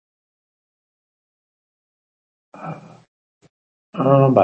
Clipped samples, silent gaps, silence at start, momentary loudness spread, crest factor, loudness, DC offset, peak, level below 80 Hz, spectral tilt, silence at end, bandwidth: under 0.1%; 3.08-3.41 s, 3.50-3.93 s; 2.6 s; 22 LU; 22 dB; -16 LUFS; under 0.1%; 0 dBFS; -68 dBFS; -10.5 dB/octave; 0 s; 3.3 kHz